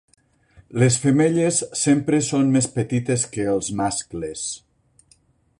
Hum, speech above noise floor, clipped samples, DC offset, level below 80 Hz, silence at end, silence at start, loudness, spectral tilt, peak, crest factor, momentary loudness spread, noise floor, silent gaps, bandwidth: none; 39 dB; under 0.1%; under 0.1%; -54 dBFS; 1.05 s; 0.7 s; -21 LUFS; -5 dB/octave; -6 dBFS; 16 dB; 11 LU; -59 dBFS; none; 11.5 kHz